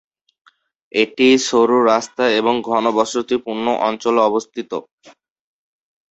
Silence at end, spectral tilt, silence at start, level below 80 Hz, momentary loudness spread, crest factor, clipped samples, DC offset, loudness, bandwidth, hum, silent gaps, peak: 1 s; -3.5 dB/octave; 0.95 s; -62 dBFS; 9 LU; 16 dB; under 0.1%; under 0.1%; -17 LUFS; 8.2 kHz; none; 4.92-4.98 s; -2 dBFS